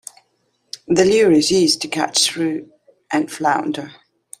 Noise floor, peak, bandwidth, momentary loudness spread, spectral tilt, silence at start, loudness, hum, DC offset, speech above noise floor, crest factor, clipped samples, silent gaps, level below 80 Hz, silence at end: -66 dBFS; 0 dBFS; 15 kHz; 20 LU; -3.5 dB/octave; 0.9 s; -17 LUFS; none; under 0.1%; 49 dB; 18 dB; under 0.1%; none; -56 dBFS; 0.5 s